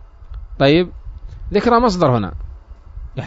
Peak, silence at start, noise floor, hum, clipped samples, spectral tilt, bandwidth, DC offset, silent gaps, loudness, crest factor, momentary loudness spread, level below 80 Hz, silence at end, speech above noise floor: -2 dBFS; 0 s; -36 dBFS; none; under 0.1%; -7 dB/octave; 7.8 kHz; under 0.1%; none; -16 LUFS; 16 dB; 23 LU; -32 dBFS; 0 s; 22 dB